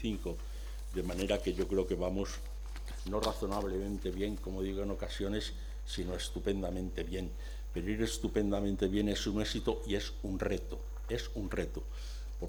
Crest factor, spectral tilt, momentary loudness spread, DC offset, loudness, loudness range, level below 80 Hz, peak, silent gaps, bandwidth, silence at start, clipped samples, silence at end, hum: 18 dB; -5.5 dB/octave; 11 LU; under 0.1%; -37 LUFS; 3 LU; -42 dBFS; -16 dBFS; none; 19.5 kHz; 0 s; under 0.1%; 0 s; none